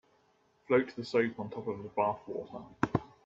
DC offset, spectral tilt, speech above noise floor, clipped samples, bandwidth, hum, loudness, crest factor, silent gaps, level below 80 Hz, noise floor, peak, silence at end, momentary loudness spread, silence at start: under 0.1%; -7.5 dB/octave; 37 dB; under 0.1%; 7.8 kHz; none; -33 LUFS; 24 dB; none; -64 dBFS; -70 dBFS; -10 dBFS; 0.2 s; 11 LU; 0.7 s